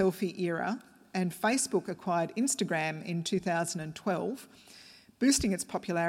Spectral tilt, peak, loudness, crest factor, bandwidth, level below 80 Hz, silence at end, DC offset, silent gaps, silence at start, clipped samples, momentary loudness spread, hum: -4 dB/octave; -16 dBFS; -31 LUFS; 16 dB; 16.5 kHz; -58 dBFS; 0 s; under 0.1%; none; 0 s; under 0.1%; 12 LU; none